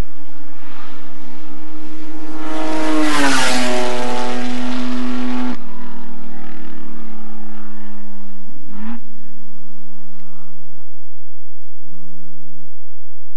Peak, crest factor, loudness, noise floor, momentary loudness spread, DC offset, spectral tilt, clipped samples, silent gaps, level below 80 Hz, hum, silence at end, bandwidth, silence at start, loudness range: 0 dBFS; 20 dB; -21 LUFS; -54 dBFS; 26 LU; 50%; -4.5 dB/octave; under 0.1%; none; -54 dBFS; none; 0.7 s; 11.5 kHz; 0 s; 20 LU